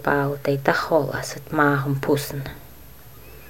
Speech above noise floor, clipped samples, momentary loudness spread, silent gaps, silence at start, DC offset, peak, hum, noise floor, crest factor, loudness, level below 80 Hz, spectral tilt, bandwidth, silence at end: 23 dB; under 0.1%; 12 LU; none; 0 s; 0.5%; -2 dBFS; none; -45 dBFS; 22 dB; -22 LUFS; -50 dBFS; -6 dB/octave; 16.5 kHz; 0 s